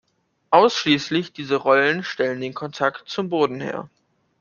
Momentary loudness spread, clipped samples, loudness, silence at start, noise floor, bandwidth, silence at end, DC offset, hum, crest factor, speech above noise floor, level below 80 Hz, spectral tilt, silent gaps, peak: 12 LU; under 0.1%; -21 LUFS; 0.5 s; -46 dBFS; 7.2 kHz; 0.55 s; under 0.1%; none; 20 dB; 26 dB; -66 dBFS; -4.5 dB/octave; none; -2 dBFS